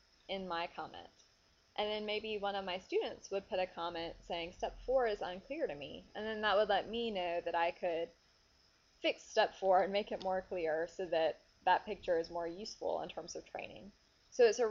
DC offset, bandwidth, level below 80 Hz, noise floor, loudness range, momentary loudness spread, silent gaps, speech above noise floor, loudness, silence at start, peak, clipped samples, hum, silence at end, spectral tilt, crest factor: under 0.1%; 7.4 kHz; -66 dBFS; -70 dBFS; 5 LU; 14 LU; none; 34 dB; -37 LUFS; 0.3 s; -18 dBFS; under 0.1%; none; 0 s; -1.5 dB/octave; 20 dB